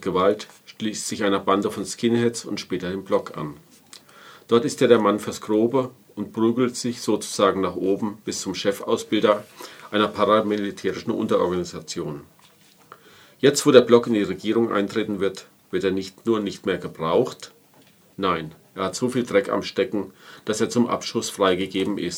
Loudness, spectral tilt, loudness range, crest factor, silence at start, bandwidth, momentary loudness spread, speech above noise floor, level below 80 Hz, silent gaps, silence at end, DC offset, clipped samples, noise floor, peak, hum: -23 LUFS; -4.5 dB/octave; 5 LU; 22 dB; 0 s; 16.5 kHz; 12 LU; 32 dB; -64 dBFS; none; 0 s; under 0.1%; under 0.1%; -55 dBFS; 0 dBFS; none